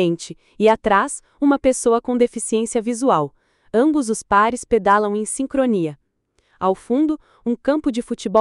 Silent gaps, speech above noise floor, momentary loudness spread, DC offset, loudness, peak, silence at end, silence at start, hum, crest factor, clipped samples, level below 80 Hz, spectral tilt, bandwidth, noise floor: none; 47 dB; 8 LU; under 0.1%; -19 LUFS; -4 dBFS; 0 s; 0 s; none; 16 dB; under 0.1%; -50 dBFS; -5 dB/octave; 12 kHz; -65 dBFS